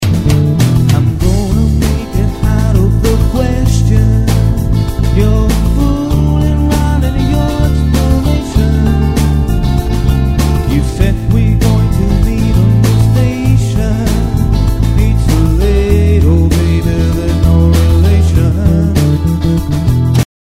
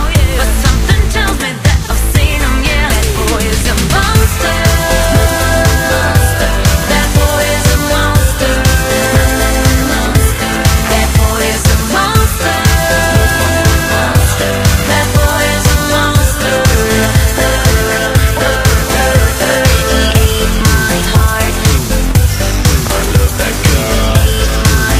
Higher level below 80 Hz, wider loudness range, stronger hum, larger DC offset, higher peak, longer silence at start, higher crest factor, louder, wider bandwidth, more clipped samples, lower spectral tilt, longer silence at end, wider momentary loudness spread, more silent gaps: about the same, -14 dBFS vs -14 dBFS; about the same, 2 LU vs 1 LU; neither; first, 2% vs under 0.1%; about the same, 0 dBFS vs 0 dBFS; about the same, 0 s vs 0 s; about the same, 10 dB vs 10 dB; about the same, -11 LUFS vs -11 LUFS; about the same, 16 kHz vs 16 kHz; second, under 0.1% vs 0.3%; first, -7 dB/octave vs -4 dB/octave; first, 0.2 s vs 0 s; about the same, 4 LU vs 2 LU; neither